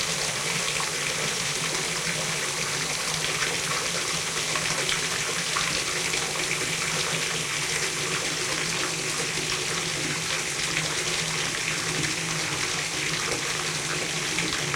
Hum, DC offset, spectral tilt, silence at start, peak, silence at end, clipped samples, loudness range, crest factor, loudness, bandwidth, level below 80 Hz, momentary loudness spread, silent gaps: none; under 0.1%; -1.5 dB/octave; 0 s; -8 dBFS; 0 s; under 0.1%; 1 LU; 20 dB; -25 LUFS; 16.5 kHz; -54 dBFS; 1 LU; none